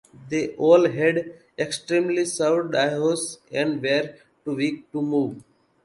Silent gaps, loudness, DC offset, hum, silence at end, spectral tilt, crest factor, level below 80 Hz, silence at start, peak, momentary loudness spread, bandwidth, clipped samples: none; -23 LUFS; under 0.1%; none; 0.4 s; -4.5 dB/octave; 20 dB; -68 dBFS; 0.2 s; -4 dBFS; 13 LU; 11.5 kHz; under 0.1%